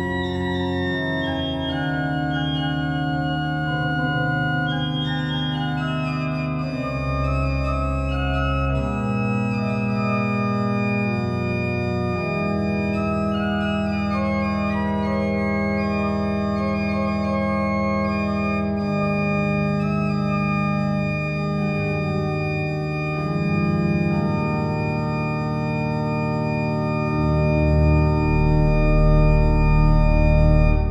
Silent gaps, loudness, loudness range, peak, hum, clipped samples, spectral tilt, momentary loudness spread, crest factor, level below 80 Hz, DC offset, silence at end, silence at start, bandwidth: none; -22 LUFS; 4 LU; -4 dBFS; none; under 0.1%; -8 dB/octave; 6 LU; 16 dB; -28 dBFS; under 0.1%; 0 s; 0 s; 8.2 kHz